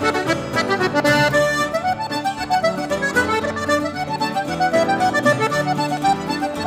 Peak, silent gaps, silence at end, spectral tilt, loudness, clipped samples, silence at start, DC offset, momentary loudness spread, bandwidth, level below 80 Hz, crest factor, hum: -4 dBFS; none; 0 s; -4.5 dB/octave; -19 LUFS; under 0.1%; 0 s; under 0.1%; 6 LU; 16 kHz; -48 dBFS; 16 dB; none